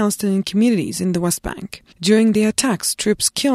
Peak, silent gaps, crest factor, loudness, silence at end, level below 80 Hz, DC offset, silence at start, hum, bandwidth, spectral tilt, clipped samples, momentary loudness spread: -2 dBFS; none; 16 dB; -18 LUFS; 0 s; -46 dBFS; under 0.1%; 0 s; none; 15.5 kHz; -4 dB/octave; under 0.1%; 9 LU